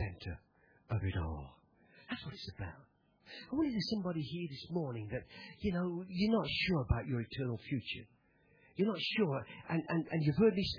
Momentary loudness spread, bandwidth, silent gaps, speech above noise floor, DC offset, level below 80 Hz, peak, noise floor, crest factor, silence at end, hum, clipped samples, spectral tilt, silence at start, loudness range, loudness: 15 LU; 5.4 kHz; none; 33 dB; under 0.1%; -54 dBFS; -18 dBFS; -69 dBFS; 20 dB; 0 s; none; under 0.1%; -5.5 dB/octave; 0 s; 5 LU; -37 LUFS